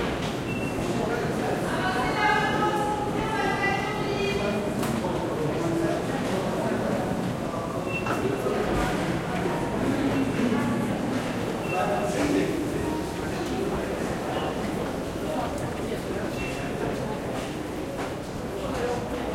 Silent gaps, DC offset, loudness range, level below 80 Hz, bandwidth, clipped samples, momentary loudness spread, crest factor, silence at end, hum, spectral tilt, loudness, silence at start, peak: none; under 0.1%; 5 LU; -44 dBFS; 16.5 kHz; under 0.1%; 6 LU; 16 dB; 0 s; none; -5.5 dB/octave; -27 LUFS; 0 s; -10 dBFS